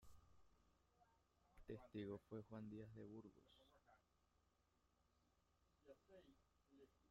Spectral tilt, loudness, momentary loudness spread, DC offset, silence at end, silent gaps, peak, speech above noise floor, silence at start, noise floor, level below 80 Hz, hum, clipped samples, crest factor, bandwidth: -7 dB/octave; -58 LUFS; 14 LU; under 0.1%; 0 s; none; -42 dBFS; 28 dB; 0 s; -84 dBFS; -80 dBFS; none; under 0.1%; 20 dB; 7.2 kHz